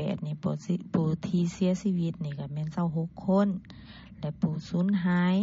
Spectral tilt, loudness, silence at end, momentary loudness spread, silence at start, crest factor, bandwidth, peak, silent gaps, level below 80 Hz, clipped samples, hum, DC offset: -8 dB/octave; -29 LUFS; 0 s; 12 LU; 0 s; 16 dB; 7.8 kHz; -12 dBFS; none; -58 dBFS; under 0.1%; none; under 0.1%